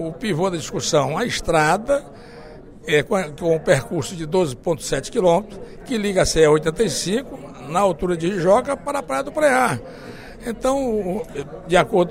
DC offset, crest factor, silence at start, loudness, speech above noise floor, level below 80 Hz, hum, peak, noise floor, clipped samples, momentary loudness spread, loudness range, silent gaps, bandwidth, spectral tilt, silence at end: under 0.1%; 20 dB; 0 s; -20 LUFS; 20 dB; -42 dBFS; none; -2 dBFS; -40 dBFS; under 0.1%; 17 LU; 2 LU; none; 16 kHz; -4.5 dB/octave; 0 s